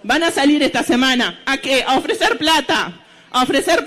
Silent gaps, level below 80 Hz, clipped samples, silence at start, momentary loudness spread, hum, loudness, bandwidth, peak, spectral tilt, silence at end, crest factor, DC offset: none; -46 dBFS; under 0.1%; 0.05 s; 5 LU; none; -16 LUFS; 15 kHz; -4 dBFS; -2.5 dB/octave; 0 s; 12 dB; under 0.1%